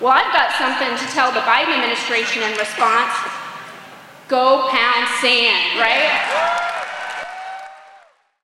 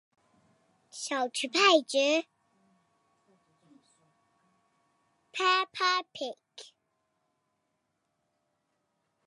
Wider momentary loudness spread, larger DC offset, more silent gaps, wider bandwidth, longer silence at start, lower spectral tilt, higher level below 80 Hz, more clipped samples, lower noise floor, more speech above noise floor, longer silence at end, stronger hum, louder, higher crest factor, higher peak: second, 16 LU vs 25 LU; neither; neither; first, 16 kHz vs 11.5 kHz; second, 0 s vs 0.95 s; about the same, -1 dB/octave vs -0.5 dB/octave; first, -66 dBFS vs under -90 dBFS; neither; second, -50 dBFS vs -80 dBFS; second, 33 dB vs 52 dB; second, 0.45 s vs 2.65 s; neither; first, -16 LUFS vs -27 LUFS; second, 16 dB vs 26 dB; first, -2 dBFS vs -8 dBFS